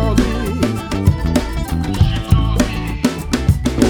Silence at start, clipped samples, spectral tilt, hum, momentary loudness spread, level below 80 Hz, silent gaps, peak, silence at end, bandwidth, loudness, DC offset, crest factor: 0 s; under 0.1%; -6 dB/octave; none; 4 LU; -22 dBFS; none; 0 dBFS; 0 s; over 20 kHz; -18 LUFS; under 0.1%; 16 dB